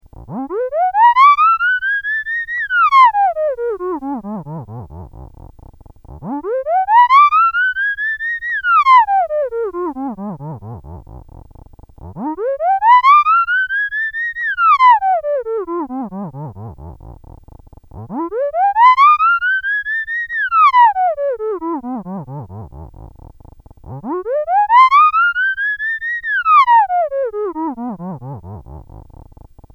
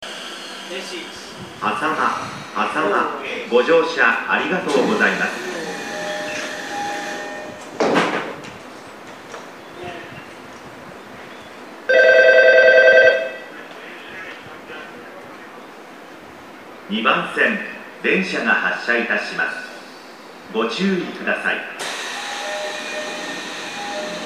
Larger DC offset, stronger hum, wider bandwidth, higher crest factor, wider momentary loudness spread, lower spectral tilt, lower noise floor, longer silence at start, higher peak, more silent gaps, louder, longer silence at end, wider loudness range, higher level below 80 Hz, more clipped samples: second, under 0.1% vs 0.1%; neither; second, 7 kHz vs 15 kHz; about the same, 16 dB vs 20 dB; about the same, 21 LU vs 23 LU; first, -6 dB/octave vs -3.5 dB/octave; about the same, -41 dBFS vs -39 dBFS; first, 0.2 s vs 0 s; about the same, 0 dBFS vs 0 dBFS; neither; first, -13 LUFS vs -18 LUFS; first, 0.7 s vs 0 s; about the same, 11 LU vs 13 LU; first, -44 dBFS vs -66 dBFS; neither